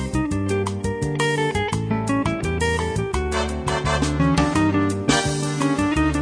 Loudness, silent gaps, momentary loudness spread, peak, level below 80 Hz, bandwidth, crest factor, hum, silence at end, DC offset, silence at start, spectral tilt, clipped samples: -22 LUFS; none; 5 LU; -4 dBFS; -32 dBFS; 11 kHz; 16 dB; none; 0 s; under 0.1%; 0 s; -5.5 dB/octave; under 0.1%